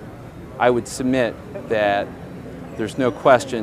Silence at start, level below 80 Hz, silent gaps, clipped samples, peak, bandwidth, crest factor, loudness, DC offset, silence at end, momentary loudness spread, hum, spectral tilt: 0 s; -48 dBFS; none; under 0.1%; 0 dBFS; 15 kHz; 20 dB; -20 LUFS; under 0.1%; 0 s; 19 LU; none; -5 dB/octave